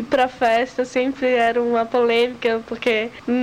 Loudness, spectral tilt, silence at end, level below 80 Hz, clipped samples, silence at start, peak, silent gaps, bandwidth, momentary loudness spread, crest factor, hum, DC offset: -20 LUFS; -4 dB/octave; 0 s; -56 dBFS; under 0.1%; 0 s; -8 dBFS; none; 11 kHz; 5 LU; 12 dB; none; under 0.1%